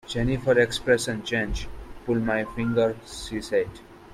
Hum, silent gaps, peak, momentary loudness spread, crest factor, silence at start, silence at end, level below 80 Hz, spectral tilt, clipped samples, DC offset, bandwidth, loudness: none; none; -6 dBFS; 13 LU; 18 dB; 0.05 s; 0 s; -40 dBFS; -5 dB/octave; under 0.1%; under 0.1%; 13.5 kHz; -25 LUFS